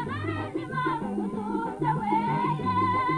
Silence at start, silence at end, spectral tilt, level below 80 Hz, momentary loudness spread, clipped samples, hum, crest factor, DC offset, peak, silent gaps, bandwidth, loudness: 0 s; 0 s; -7.5 dB/octave; -54 dBFS; 6 LU; under 0.1%; none; 14 dB; under 0.1%; -12 dBFS; none; 10.5 kHz; -28 LUFS